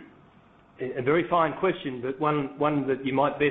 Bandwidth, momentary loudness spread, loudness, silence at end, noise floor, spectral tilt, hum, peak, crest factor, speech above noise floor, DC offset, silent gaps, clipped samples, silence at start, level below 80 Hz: 4.2 kHz; 9 LU; -26 LUFS; 0 s; -56 dBFS; -5 dB/octave; none; -10 dBFS; 18 dB; 31 dB; under 0.1%; none; under 0.1%; 0 s; -60 dBFS